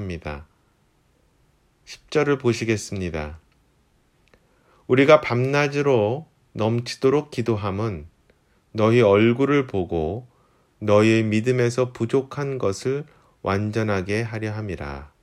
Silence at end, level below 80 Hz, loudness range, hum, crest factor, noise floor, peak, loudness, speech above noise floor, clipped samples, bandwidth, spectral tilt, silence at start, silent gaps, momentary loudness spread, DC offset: 0.15 s; -48 dBFS; 7 LU; none; 22 dB; -63 dBFS; 0 dBFS; -22 LUFS; 42 dB; under 0.1%; 12.5 kHz; -6.5 dB/octave; 0 s; none; 16 LU; under 0.1%